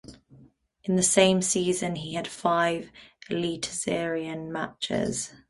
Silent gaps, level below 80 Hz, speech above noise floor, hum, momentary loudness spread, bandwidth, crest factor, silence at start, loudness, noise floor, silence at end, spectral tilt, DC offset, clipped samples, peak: none; -60 dBFS; 30 dB; none; 13 LU; 11.5 kHz; 22 dB; 0.05 s; -26 LUFS; -57 dBFS; 0.15 s; -3.5 dB/octave; under 0.1%; under 0.1%; -6 dBFS